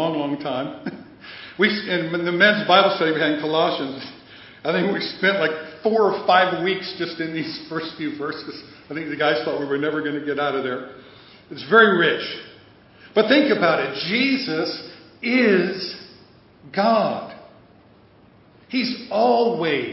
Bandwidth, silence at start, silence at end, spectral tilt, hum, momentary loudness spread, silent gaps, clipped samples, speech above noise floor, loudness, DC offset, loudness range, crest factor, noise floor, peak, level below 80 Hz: 5.8 kHz; 0 s; 0 s; -8.5 dB/octave; none; 18 LU; none; under 0.1%; 31 dB; -20 LUFS; under 0.1%; 6 LU; 20 dB; -52 dBFS; 0 dBFS; -66 dBFS